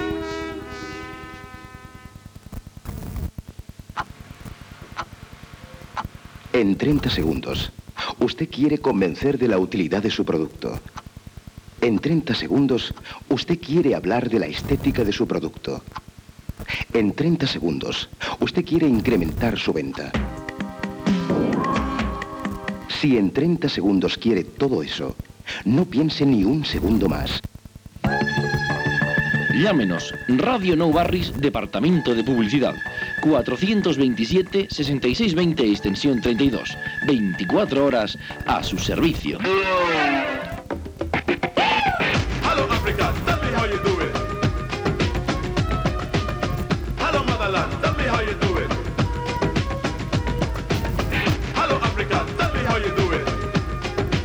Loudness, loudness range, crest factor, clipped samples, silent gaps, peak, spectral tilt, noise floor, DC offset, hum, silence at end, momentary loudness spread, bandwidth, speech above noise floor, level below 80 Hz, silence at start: -22 LUFS; 5 LU; 16 dB; under 0.1%; none; -6 dBFS; -6 dB/octave; -45 dBFS; under 0.1%; none; 0 s; 15 LU; 18 kHz; 24 dB; -36 dBFS; 0 s